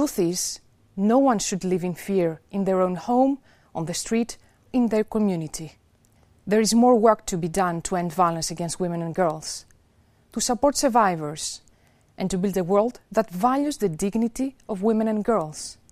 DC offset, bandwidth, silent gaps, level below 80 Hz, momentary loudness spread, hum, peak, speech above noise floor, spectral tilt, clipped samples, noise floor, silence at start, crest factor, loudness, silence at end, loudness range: under 0.1%; 15.5 kHz; none; -52 dBFS; 13 LU; none; -4 dBFS; 37 dB; -5 dB/octave; under 0.1%; -60 dBFS; 0 s; 20 dB; -23 LUFS; 0.2 s; 3 LU